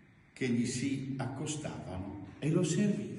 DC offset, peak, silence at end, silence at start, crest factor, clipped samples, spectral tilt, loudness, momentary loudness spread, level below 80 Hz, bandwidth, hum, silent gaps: under 0.1%; -18 dBFS; 0 s; 0.35 s; 16 dB; under 0.1%; -5.5 dB/octave; -35 LUFS; 11 LU; -64 dBFS; 11.5 kHz; none; none